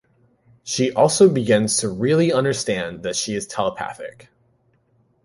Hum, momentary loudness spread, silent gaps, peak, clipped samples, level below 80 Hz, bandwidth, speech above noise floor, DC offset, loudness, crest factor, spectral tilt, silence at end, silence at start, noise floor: none; 16 LU; none; -2 dBFS; under 0.1%; -56 dBFS; 11.5 kHz; 43 dB; under 0.1%; -19 LUFS; 18 dB; -4.5 dB/octave; 1.15 s; 0.65 s; -62 dBFS